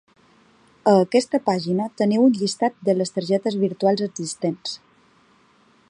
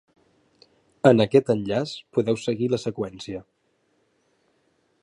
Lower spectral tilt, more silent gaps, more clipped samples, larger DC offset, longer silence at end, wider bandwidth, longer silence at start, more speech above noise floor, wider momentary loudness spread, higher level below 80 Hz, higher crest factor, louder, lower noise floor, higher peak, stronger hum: about the same, -5.5 dB/octave vs -6.5 dB/octave; neither; neither; neither; second, 1.15 s vs 1.6 s; about the same, 11 kHz vs 11 kHz; second, 0.85 s vs 1.05 s; second, 37 dB vs 46 dB; second, 9 LU vs 15 LU; second, -70 dBFS vs -60 dBFS; second, 18 dB vs 24 dB; about the same, -21 LUFS vs -23 LUFS; second, -57 dBFS vs -69 dBFS; about the same, -4 dBFS vs -2 dBFS; neither